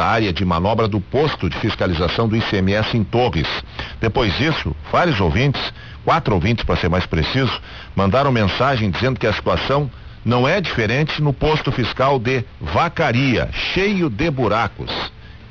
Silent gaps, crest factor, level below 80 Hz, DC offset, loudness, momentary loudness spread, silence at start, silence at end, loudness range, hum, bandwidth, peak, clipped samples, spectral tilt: none; 12 dB; -32 dBFS; 0.4%; -18 LUFS; 6 LU; 0 s; 0 s; 1 LU; none; 7.2 kHz; -6 dBFS; under 0.1%; -7 dB/octave